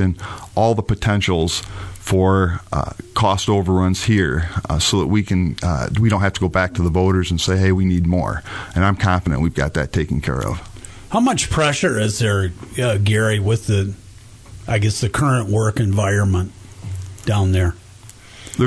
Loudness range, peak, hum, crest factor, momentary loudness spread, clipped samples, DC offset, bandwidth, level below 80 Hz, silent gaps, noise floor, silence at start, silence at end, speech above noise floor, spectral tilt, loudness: 2 LU; -4 dBFS; none; 14 dB; 10 LU; under 0.1%; under 0.1%; 11 kHz; -34 dBFS; none; -41 dBFS; 0 s; 0 s; 24 dB; -5.5 dB/octave; -18 LUFS